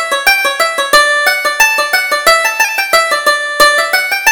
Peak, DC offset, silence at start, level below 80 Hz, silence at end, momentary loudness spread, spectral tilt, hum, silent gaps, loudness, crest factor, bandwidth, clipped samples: 0 dBFS; under 0.1%; 0 s; -44 dBFS; 0 s; 4 LU; 1.5 dB/octave; none; none; -9 LUFS; 12 dB; over 20 kHz; 0.3%